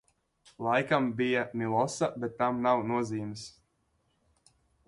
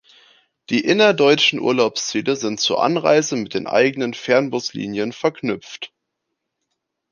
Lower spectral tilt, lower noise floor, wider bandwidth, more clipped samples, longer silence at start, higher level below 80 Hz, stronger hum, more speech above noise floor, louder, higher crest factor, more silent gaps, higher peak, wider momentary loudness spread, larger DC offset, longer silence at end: first, -5.5 dB/octave vs -3.5 dB/octave; second, -74 dBFS vs -78 dBFS; first, 11.5 kHz vs 10 kHz; neither; about the same, 0.6 s vs 0.7 s; about the same, -68 dBFS vs -64 dBFS; neither; second, 45 dB vs 59 dB; second, -30 LUFS vs -18 LUFS; about the same, 20 dB vs 18 dB; neither; second, -12 dBFS vs -2 dBFS; about the same, 10 LU vs 12 LU; neither; about the same, 1.35 s vs 1.25 s